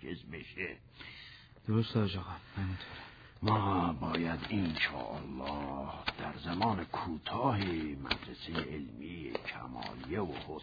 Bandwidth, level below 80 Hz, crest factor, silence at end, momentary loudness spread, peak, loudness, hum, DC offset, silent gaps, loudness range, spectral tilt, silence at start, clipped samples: 5 kHz; -56 dBFS; 22 dB; 0 s; 13 LU; -16 dBFS; -37 LUFS; none; under 0.1%; none; 3 LU; -4.5 dB/octave; 0 s; under 0.1%